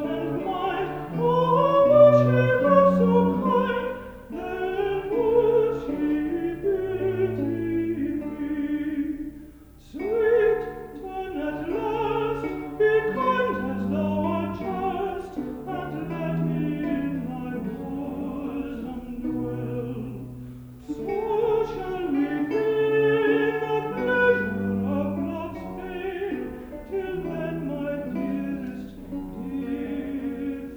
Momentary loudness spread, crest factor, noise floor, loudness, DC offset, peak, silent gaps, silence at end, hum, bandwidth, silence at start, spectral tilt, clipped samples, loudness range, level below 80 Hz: 14 LU; 20 dB; -47 dBFS; -25 LUFS; under 0.1%; -6 dBFS; none; 0 s; none; over 20 kHz; 0 s; -8.5 dB/octave; under 0.1%; 11 LU; -48 dBFS